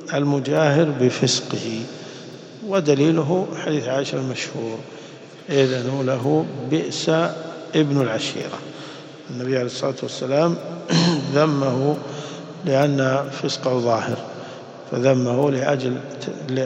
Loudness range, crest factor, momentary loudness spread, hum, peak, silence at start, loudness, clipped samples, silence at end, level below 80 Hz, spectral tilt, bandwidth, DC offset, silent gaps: 3 LU; 18 dB; 16 LU; none; -4 dBFS; 0 s; -21 LUFS; under 0.1%; 0 s; -66 dBFS; -5.5 dB/octave; 8.8 kHz; under 0.1%; none